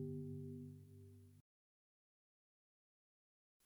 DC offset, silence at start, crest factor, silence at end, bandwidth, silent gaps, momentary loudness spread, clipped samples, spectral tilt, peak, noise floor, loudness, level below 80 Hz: under 0.1%; 0 s; 18 dB; 2.25 s; over 20 kHz; none; 16 LU; under 0.1%; -10 dB/octave; -38 dBFS; under -90 dBFS; -53 LUFS; under -90 dBFS